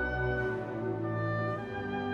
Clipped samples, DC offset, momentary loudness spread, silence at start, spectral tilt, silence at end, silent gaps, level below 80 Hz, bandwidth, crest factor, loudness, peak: under 0.1%; under 0.1%; 4 LU; 0 s; -8.5 dB/octave; 0 s; none; -48 dBFS; 6.8 kHz; 14 dB; -34 LUFS; -20 dBFS